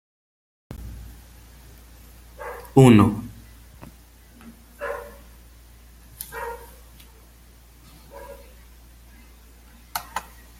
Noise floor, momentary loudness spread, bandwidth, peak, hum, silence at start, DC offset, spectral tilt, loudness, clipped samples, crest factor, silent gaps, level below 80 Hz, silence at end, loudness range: -50 dBFS; 31 LU; 16.5 kHz; -2 dBFS; none; 0.7 s; under 0.1%; -7 dB/octave; -21 LUFS; under 0.1%; 24 dB; none; -46 dBFS; 0.4 s; 19 LU